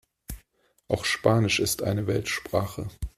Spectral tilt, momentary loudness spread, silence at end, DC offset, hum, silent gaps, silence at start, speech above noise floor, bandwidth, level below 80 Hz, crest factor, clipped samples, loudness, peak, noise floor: -4.5 dB/octave; 20 LU; 0.1 s; under 0.1%; none; none; 0.3 s; 41 dB; 15 kHz; -46 dBFS; 22 dB; under 0.1%; -26 LUFS; -6 dBFS; -66 dBFS